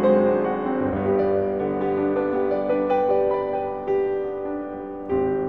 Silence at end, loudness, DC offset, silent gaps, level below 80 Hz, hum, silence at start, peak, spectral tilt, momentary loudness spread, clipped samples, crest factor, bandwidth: 0 s; -23 LUFS; 0.2%; none; -50 dBFS; none; 0 s; -6 dBFS; -10 dB/octave; 8 LU; under 0.1%; 16 dB; 4.5 kHz